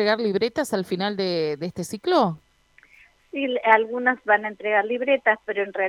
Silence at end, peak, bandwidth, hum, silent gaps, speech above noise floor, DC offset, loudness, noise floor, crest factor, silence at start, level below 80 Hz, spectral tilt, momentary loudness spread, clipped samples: 0 s; -4 dBFS; 16 kHz; none; none; 34 dB; under 0.1%; -23 LUFS; -57 dBFS; 20 dB; 0 s; -66 dBFS; -5 dB/octave; 10 LU; under 0.1%